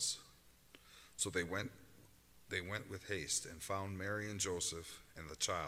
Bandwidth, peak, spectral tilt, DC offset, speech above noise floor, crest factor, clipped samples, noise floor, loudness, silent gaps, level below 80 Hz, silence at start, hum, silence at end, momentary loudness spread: 16 kHz; -22 dBFS; -2.5 dB/octave; under 0.1%; 23 dB; 22 dB; under 0.1%; -65 dBFS; -41 LUFS; none; -68 dBFS; 0 s; none; 0 s; 14 LU